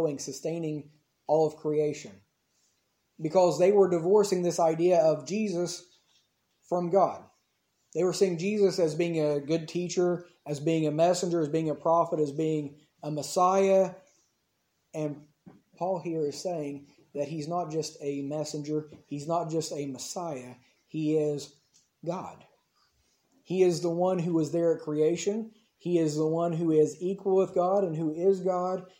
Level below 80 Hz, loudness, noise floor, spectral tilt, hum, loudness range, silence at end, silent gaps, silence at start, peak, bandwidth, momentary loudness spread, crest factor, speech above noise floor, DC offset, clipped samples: -78 dBFS; -28 LUFS; -76 dBFS; -6 dB/octave; none; 8 LU; 0.15 s; none; 0 s; -10 dBFS; 16.5 kHz; 14 LU; 18 dB; 48 dB; under 0.1%; under 0.1%